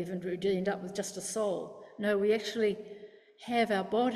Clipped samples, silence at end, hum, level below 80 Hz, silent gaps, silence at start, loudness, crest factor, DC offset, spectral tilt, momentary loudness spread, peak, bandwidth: under 0.1%; 0 s; none; -72 dBFS; none; 0 s; -32 LUFS; 16 dB; under 0.1%; -4.5 dB/octave; 14 LU; -16 dBFS; 14 kHz